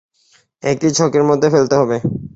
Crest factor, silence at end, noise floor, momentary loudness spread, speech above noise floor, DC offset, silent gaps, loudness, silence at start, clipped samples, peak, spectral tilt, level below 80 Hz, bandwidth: 14 dB; 0.05 s; -56 dBFS; 8 LU; 42 dB; under 0.1%; none; -15 LUFS; 0.65 s; under 0.1%; -2 dBFS; -5.5 dB/octave; -50 dBFS; 8 kHz